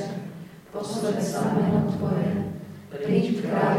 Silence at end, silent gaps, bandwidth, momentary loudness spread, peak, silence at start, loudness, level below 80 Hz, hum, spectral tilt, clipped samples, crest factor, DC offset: 0 s; none; 15.5 kHz; 16 LU; -8 dBFS; 0 s; -26 LUFS; -58 dBFS; none; -7 dB/octave; under 0.1%; 16 dB; under 0.1%